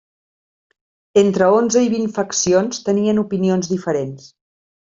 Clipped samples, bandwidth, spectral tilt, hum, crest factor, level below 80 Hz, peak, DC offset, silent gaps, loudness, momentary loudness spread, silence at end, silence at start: under 0.1%; 7.8 kHz; -5 dB/octave; none; 18 dB; -58 dBFS; -2 dBFS; under 0.1%; none; -17 LUFS; 7 LU; 0.75 s; 1.15 s